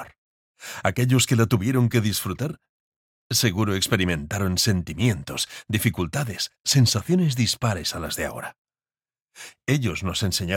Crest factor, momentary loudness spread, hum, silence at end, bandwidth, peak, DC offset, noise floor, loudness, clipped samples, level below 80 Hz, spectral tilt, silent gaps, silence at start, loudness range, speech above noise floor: 20 dB; 12 LU; none; 0 s; 17 kHz; -4 dBFS; under 0.1%; under -90 dBFS; -23 LUFS; under 0.1%; -48 dBFS; -4.5 dB/octave; 0.18-0.55 s, 2.69-3.30 s, 6.60-6.64 s, 8.58-8.65 s; 0 s; 2 LU; over 67 dB